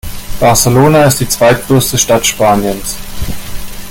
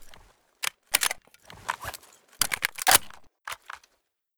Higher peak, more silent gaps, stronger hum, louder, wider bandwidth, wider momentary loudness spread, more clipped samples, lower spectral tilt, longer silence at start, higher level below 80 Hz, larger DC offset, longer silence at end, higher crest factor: about the same, 0 dBFS vs -2 dBFS; neither; neither; first, -9 LUFS vs -25 LUFS; second, 17.5 kHz vs over 20 kHz; second, 16 LU vs 23 LU; neither; first, -4 dB/octave vs 1 dB/octave; about the same, 0.05 s vs 0 s; first, -26 dBFS vs -58 dBFS; neither; second, 0 s vs 0.6 s; second, 10 dB vs 30 dB